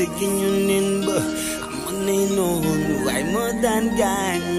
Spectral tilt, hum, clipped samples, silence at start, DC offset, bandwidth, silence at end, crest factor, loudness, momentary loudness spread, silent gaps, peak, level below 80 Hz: -4.5 dB/octave; none; under 0.1%; 0 s; under 0.1%; 15.5 kHz; 0 s; 14 dB; -21 LUFS; 5 LU; none; -6 dBFS; -44 dBFS